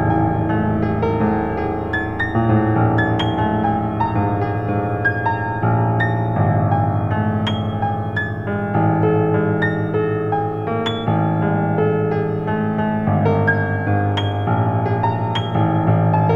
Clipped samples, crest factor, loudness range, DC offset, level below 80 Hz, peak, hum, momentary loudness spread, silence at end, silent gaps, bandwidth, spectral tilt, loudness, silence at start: under 0.1%; 14 dB; 1 LU; under 0.1%; -38 dBFS; -4 dBFS; none; 5 LU; 0 s; none; 6.8 kHz; -9 dB/octave; -19 LUFS; 0 s